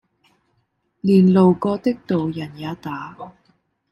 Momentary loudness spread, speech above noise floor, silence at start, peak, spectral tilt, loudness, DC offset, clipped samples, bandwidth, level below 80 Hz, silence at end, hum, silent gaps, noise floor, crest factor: 20 LU; 50 dB; 1.05 s; -4 dBFS; -9.5 dB/octave; -19 LUFS; under 0.1%; under 0.1%; 5.6 kHz; -58 dBFS; 0.6 s; none; none; -68 dBFS; 18 dB